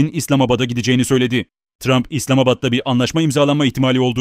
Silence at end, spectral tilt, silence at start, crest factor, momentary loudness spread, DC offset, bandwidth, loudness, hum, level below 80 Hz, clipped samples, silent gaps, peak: 0 s; -5.5 dB/octave; 0 s; 14 dB; 3 LU; under 0.1%; 16 kHz; -16 LUFS; none; -46 dBFS; under 0.1%; 1.75-1.79 s; -2 dBFS